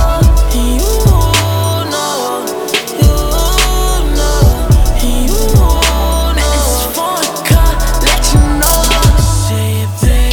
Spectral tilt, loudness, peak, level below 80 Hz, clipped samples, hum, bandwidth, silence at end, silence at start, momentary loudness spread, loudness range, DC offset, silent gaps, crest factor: -4.5 dB/octave; -12 LUFS; 0 dBFS; -12 dBFS; under 0.1%; none; over 20 kHz; 0 s; 0 s; 5 LU; 2 LU; under 0.1%; none; 10 dB